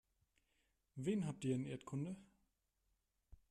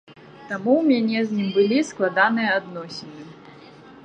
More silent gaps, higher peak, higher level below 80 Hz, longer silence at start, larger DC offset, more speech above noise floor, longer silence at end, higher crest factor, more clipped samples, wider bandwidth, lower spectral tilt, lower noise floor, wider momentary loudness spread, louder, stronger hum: neither; second, -28 dBFS vs -4 dBFS; about the same, -74 dBFS vs -70 dBFS; first, 0.95 s vs 0.1 s; neither; first, 42 dB vs 24 dB; about the same, 0.15 s vs 0.1 s; about the same, 18 dB vs 20 dB; neither; first, 12.5 kHz vs 9.4 kHz; first, -7 dB/octave vs -5.5 dB/octave; first, -85 dBFS vs -45 dBFS; second, 11 LU vs 17 LU; second, -44 LUFS vs -21 LUFS; neither